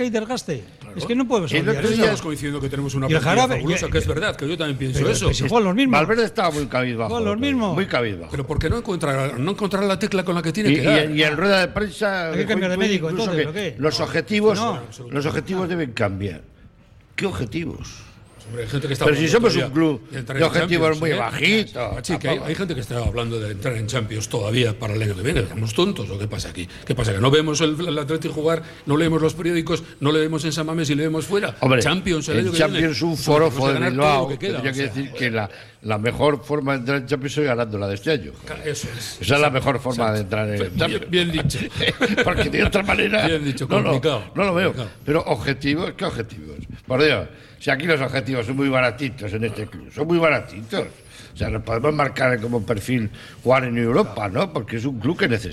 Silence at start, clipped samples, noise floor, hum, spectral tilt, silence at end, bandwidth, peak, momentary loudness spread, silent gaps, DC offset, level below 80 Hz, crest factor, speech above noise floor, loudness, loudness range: 0 s; under 0.1%; -50 dBFS; none; -5.5 dB/octave; 0 s; 15.5 kHz; -4 dBFS; 10 LU; none; under 0.1%; -40 dBFS; 16 dB; 29 dB; -21 LUFS; 4 LU